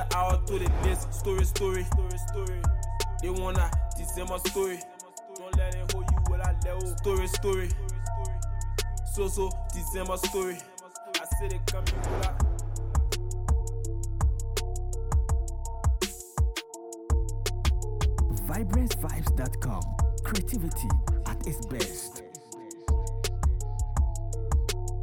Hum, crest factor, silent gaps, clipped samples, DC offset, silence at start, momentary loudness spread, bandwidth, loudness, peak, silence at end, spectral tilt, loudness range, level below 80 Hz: none; 14 dB; none; under 0.1%; under 0.1%; 0 s; 7 LU; 19 kHz; -30 LUFS; -14 dBFS; 0 s; -5 dB/octave; 2 LU; -30 dBFS